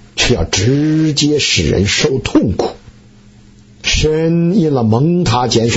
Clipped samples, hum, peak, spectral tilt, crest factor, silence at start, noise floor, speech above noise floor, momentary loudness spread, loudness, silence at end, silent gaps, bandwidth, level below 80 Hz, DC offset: under 0.1%; none; -2 dBFS; -4.5 dB/octave; 12 dB; 0.15 s; -42 dBFS; 29 dB; 3 LU; -13 LUFS; 0 s; none; 8 kHz; -30 dBFS; under 0.1%